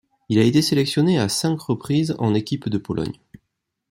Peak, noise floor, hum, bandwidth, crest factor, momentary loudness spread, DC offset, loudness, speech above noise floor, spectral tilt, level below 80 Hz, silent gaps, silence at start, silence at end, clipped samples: -4 dBFS; -78 dBFS; none; 16 kHz; 18 dB; 10 LU; under 0.1%; -21 LUFS; 58 dB; -5.5 dB/octave; -56 dBFS; none; 0.3 s; 0.75 s; under 0.1%